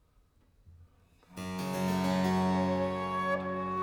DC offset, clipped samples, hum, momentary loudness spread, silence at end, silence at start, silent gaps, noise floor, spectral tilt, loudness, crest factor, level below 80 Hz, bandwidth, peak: under 0.1%; under 0.1%; none; 10 LU; 0 s; 0.65 s; none; -66 dBFS; -6.5 dB/octave; -31 LUFS; 16 dB; -62 dBFS; 18 kHz; -18 dBFS